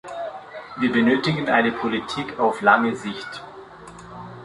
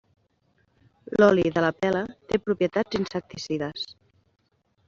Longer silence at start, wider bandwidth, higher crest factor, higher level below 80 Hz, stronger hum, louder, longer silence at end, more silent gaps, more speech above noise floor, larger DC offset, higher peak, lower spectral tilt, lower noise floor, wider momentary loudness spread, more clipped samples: second, 0.05 s vs 1.1 s; first, 11 kHz vs 7.6 kHz; about the same, 22 dB vs 22 dB; about the same, -58 dBFS vs -58 dBFS; neither; first, -21 LUFS vs -25 LUFS; second, 0 s vs 0.95 s; neither; second, 21 dB vs 44 dB; neither; about the same, -2 dBFS vs -4 dBFS; first, -6 dB/octave vs -4.5 dB/octave; second, -41 dBFS vs -68 dBFS; first, 22 LU vs 13 LU; neither